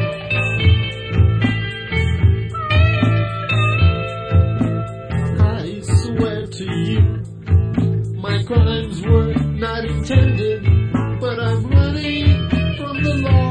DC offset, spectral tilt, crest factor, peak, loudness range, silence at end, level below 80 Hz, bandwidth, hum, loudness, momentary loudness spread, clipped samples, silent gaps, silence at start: under 0.1%; -7 dB/octave; 16 dB; -2 dBFS; 2 LU; 0 s; -28 dBFS; 9.4 kHz; none; -18 LUFS; 7 LU; under 0.1%; none; 0 s